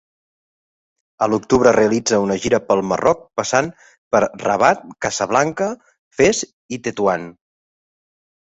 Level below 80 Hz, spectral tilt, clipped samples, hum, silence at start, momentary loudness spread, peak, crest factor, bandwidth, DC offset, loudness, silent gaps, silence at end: -52 dBFS; -4 dB/octave; under 0.1%; none; 1.2 s; 11 LU; -2 dBFS; 18 dB; 8.4 kHz; under 0.1%; -18 LUFS; 3.98-4.11 s, 5.98-6.11 s, 6.53-6.69 s; 1.25 s